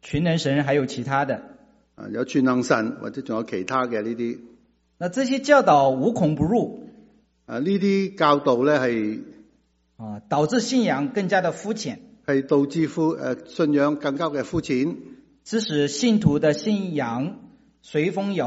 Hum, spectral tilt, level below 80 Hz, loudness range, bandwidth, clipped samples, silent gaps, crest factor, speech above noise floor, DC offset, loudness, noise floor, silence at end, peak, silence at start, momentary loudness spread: none; -5 dB/octave; -54 dBFS; 4 LU; 8 kHz; under 0.1%; none; 20 dB; 42 dB; under 0.1%; -23 LUFS; -64 dBFS; 0 s; -4 dBFS; 0.05 s; 12 LU